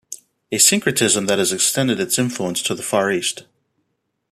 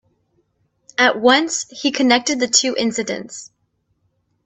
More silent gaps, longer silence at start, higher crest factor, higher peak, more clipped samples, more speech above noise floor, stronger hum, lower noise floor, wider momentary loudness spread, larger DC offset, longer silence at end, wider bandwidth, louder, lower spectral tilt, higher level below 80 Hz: neither; second, 0.1 s vs 1 s; about the same, 20 dB vs 20 dB; about the same, 0 dBFS vs 0 dBFS; neither; first, 54 dB vs 50 dB; neither; first, -73 dBFS vs -68 dBFS; about the same, 12 LU vs 13 LU; neither; about the same, 0.9 s vs 1 s; first, 15 kHz vs 8.6 kHz; about the same, -17 LUFS vs -17 LUFS; about the same, -2.5 dB/octave vs -1.5 dB/octave; about the same, -62 dBFS vs -64 dBFS